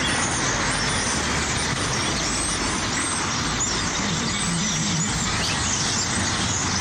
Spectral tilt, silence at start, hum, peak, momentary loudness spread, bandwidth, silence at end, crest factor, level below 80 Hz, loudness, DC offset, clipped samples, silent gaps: -2.5 dB/octave; 0 s; none; -12 dBFS; 2 LU; 16 kHz; 0 s; 12 dB; -38 dBFS; -22 LUFS; under 0.1%; under 0.1%; none